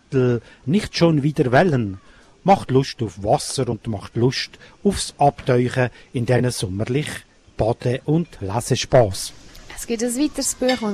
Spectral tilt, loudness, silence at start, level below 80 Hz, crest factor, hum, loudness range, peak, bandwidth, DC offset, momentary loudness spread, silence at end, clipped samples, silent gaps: -5.5 dB/octave; -21 LUFS; 0.1 s; -44 dBFS; 16 dB; none; 3 LU; -4 dBFS; 14 kHz; under 0.1%; 11 LU; 0 s; under 0.1%; none